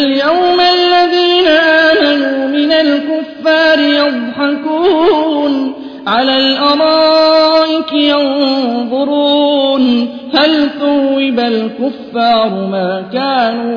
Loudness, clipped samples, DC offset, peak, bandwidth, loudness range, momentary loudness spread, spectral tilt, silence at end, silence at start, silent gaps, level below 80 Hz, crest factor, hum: -11 LUFS; under 0.1%; under 0.1%; 0 dBFS; 5.4 kHz; 3 LU; 7 LU; -5.5 dB/octave; 0 s; 0 s; none; -52 dBFS; 10 dB; none